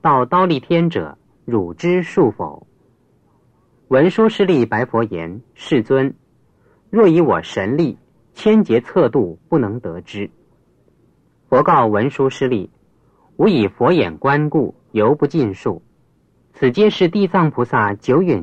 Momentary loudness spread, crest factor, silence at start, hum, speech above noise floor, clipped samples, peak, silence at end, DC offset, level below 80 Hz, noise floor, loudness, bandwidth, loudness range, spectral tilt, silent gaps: 14 LU; 16 dB; 0.05 s; none; 42 dB; under 0.1%; -2 dBFS; 0 s; under 0.1%; -56 dBFS; -57 dBFS; -16 LUFS; 8.4 kHz; 3 LU; -8 dB/octave; none